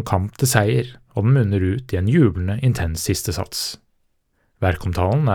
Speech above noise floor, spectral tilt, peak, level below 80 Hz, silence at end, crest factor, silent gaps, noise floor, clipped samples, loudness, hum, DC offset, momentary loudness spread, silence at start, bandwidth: 47 dB; -5.5 dB/octave; 0 dBFS; -42 dBFS; 0 s; 18 dB; none; -65 dBFS; under 0.1%; -20 LUFS; none; under 0.1%; 8 LU; 0 s; 19 kHz